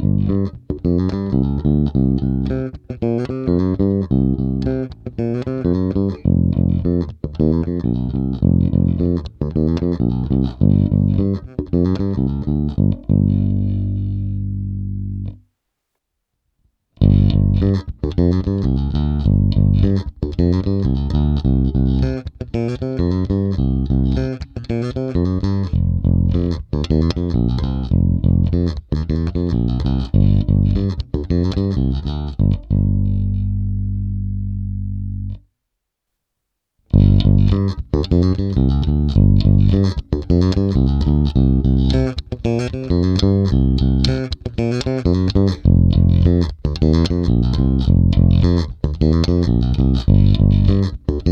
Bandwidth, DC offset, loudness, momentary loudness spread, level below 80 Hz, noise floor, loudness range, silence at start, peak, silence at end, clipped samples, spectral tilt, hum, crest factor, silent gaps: 6.8 kHz; under 0.1%; -18 LUFS; 9 LU; -24 dBFS; -78 dBFS; 5 LU; 0 s; 0 dBFS; 0 s; under 0.1%; -9 dB/octave; 50 Hz at -35 dBFS; 16 dB; none